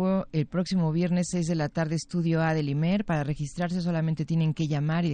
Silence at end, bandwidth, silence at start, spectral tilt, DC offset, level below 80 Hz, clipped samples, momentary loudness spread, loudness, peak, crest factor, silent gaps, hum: 0 s; 9.4 kHz; 0 s; -7 dB/octave; under 0.1%; -52 dBFS; under 0.1%; 4 LU; -27 LUFS; -12 dBFS; 14 dB; none; none